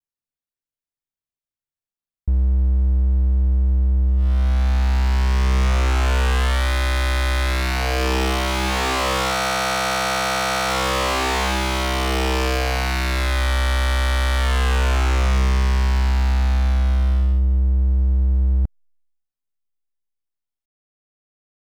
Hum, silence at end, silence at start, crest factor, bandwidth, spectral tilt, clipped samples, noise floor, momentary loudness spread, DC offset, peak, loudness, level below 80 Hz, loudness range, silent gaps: none; 2.95 s; 2.25 s; 10 dB; 15.5 kHz; -4.5 dB/octave; under 0.1%; under -90 dBFS; 2 LU; under 0.1%; -10 dBFS; -20 LUFS; -20 dBFS; 4 LU; none